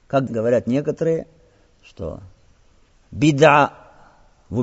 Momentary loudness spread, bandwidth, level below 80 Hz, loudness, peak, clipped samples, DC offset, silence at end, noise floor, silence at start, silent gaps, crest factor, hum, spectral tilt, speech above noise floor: 20 LU; 8 kHz; -50 dBFS; -18 LUFS; 0 dBFS; under 0.1%; under 0.1%; 0 s; -54 dBFS; 0.1 s; none; 20 dB; none; -5.5 dB/octave; 36 dB